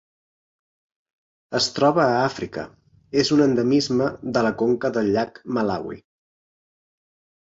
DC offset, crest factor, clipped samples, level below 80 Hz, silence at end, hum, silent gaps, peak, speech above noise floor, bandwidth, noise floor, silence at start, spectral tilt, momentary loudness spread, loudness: under 0.1%; 20 dB; under 0.1%; -58 dBFS; 1.5 s; none; none; -4 dBFS; over 69 dB; 8 kHz; under -90 dBFS; 1.5 s; -5 dB/octave; 13 LU; -21 LUFS